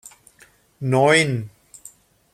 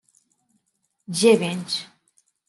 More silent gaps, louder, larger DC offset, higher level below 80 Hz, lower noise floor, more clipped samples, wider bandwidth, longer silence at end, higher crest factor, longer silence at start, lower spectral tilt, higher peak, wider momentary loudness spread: neither; about the same, -19 LUFS vs -21 LUFS; neither; first, -60 dBFS vs -74 dBFS; second, -54 dBFS vs -73 dBFS; neither; first, 15 kHz vs 12.5 kHz; first, 0.85 s vs 0.65 s; about the same, 22 dB vs 20 dB; second, 0.8 s vs 1.1 s; about the same, -4.5 dB/octave vs -4 dB/octave; about the same, -2 dBFS vs -4 dBFS; first, 16 LU vs 11 LU